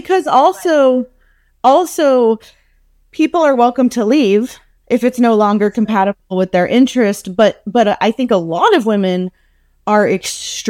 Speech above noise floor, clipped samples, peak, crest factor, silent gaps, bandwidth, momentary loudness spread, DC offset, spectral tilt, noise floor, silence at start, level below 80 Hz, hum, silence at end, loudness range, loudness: 41 dB; under 0.1%; 0 dBFS; 12 dB; none; 16.5 kHz; 7 LU; under 0.1%; -5 dB/octave; -53 dBFS; 0.05 s; -54 dBFS; none; 0 s; 1 LU; -13 LUFS